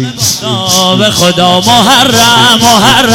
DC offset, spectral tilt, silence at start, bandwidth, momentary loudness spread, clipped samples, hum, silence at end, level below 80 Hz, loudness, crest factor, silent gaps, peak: under 0.1%; -3 dB/octave; 0 s; 18 kHz; 6 LU; 0.6%; none; 0 s; -38 dBFS; -5 LUFS; 6 dB; none; 0 dBFS